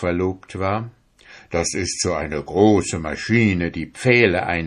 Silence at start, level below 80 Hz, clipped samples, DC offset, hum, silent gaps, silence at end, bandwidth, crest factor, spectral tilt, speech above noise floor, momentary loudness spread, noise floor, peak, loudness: 0 s; -40 dBFS; under 0.1%; under 0.1%; none; none; 0 s; 11.5 kHz; 20 dB; -5 dB/octave; 28 dB; 11 LU; -47 dBFS; 0 dBFS; -20 LUFS